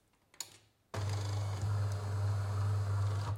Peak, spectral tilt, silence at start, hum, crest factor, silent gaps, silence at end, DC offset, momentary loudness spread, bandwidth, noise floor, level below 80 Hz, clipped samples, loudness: -24 dBFS; -5.5 dB/octave; 0.4 s; none; 12 dB; none; 0 s; under 0.1%; 12 LU; 14 kHz; -61 dBFS; -60 dBFS; under 0.1%; -37 LUFS